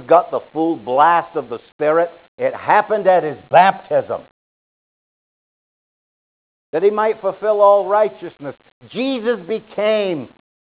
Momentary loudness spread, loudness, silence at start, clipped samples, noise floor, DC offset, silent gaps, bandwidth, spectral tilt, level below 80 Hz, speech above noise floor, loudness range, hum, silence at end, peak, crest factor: 15 LU; -17 LUFS; 0 s; under 0.1%; under -90 dBFS; under 0.1%; 1.72-1.79 s, 2.28-2.38 s, 4.31-6.73 s, 8.72-8.81 s; 4 kHz; -9 dB/octave; -66 dBFS; over 73 dB; 7 LU; none; 0.45 s; 0 dBFS; 18 dB